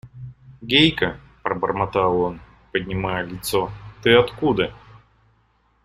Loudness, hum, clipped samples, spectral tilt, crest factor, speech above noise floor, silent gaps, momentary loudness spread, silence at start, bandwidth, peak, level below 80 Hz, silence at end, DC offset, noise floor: -21 LUFS; none; under 0.1%; -5 dB/octave; 22 dB; 42 dB; none; 18 LU; 0.05 s; 15.5 kHz; -2 dBFS; -46 dBFS; 0.9 s; under 0.1%; -62 dBFS